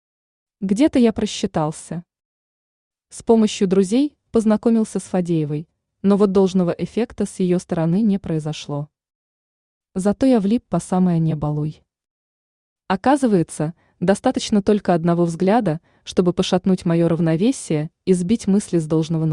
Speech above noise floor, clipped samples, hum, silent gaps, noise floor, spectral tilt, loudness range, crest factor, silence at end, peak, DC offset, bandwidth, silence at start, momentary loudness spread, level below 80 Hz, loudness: over 72 dB; under 0.1%; none; 2.25-2.91 s, 9.15-9.81 s, 12.11-12.76 s; under -90 dBFS; -7 dB/octave; 3 LU; 16 dB; 0 s; -4 dBFS; under 0.1%; 11 kHz; 0.6 s; 10 LU; -52 dBFS; -19 LUFS